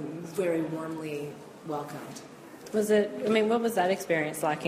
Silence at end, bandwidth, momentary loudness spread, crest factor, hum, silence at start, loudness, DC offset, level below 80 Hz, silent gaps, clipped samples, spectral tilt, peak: 0 s; 15.5 kHz; 18 LU; 18 dB; none; 0 s; -29 LUFS; under 0.1%; -72 dBFS; none; under 0.1%; -5 dB/octave; -12 dBFS